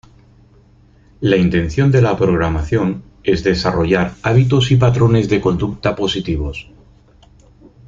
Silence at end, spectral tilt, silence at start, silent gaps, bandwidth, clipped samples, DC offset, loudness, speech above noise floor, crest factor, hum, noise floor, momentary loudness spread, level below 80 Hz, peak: 1.25 s; -7 dB/octave; 1.2 s; none; 7.6 kHz; under 0.1%; under 0.1%; -16 LUFS; 34 dB; 16 dB; none; -48 dBFS; 9 LU; -34 dBFS; 0 dBFS